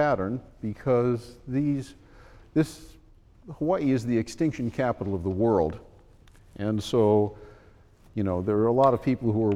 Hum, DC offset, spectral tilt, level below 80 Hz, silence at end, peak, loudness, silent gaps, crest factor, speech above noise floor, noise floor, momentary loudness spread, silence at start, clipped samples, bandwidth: none; under 0.1%; -7.5 dB/octave; -52 dBFS; 0 s; -8 dBFS; -26 LUFS; none; 18 dB; 29 dB; -54 dBFS; 11 LU; 0 s; under 0.1%; 14 kHz